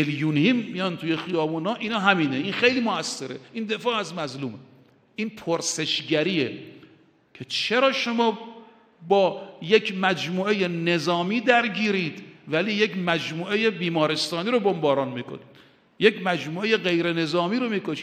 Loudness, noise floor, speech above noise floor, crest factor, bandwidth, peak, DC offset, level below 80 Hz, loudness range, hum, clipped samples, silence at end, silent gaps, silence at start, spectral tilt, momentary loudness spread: -24 LUFS; -56 dBFS; 33 dB; 22 dB; 14.5 kHz; -2 dBFS; under 0.1%; -72 dBFS; 4 LU; none; under 0.1%; 0 s; none; 0 s; -4.5 dB/octave; 12 LU